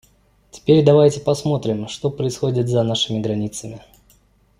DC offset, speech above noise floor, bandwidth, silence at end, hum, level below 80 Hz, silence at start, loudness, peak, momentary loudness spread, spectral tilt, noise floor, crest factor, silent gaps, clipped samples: under 0.1%; 39 dB; 15 kHz; 0.8 s; none; -52 dBFS; 0.55 s; -19 LUFS; -2 dBFS; 13 LU; -6.5 dB/octave; -56 dBFS; 18 dB; none; under 0.1%